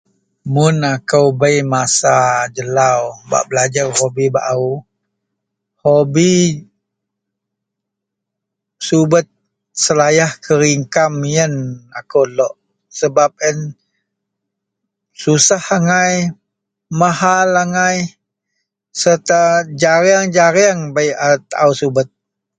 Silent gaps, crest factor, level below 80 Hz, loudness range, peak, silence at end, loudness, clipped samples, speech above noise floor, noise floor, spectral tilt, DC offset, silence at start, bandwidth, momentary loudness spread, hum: none; 16 dB; -56 dBFS; 5 LU; 0 dBFS; 0.5 s; -14 LUFS; under 0.1%; 66 dB; -79 dBFS; -4 dB/octave; under 0.1%; 0.45 s; 9.6 kHz; 10 LU; none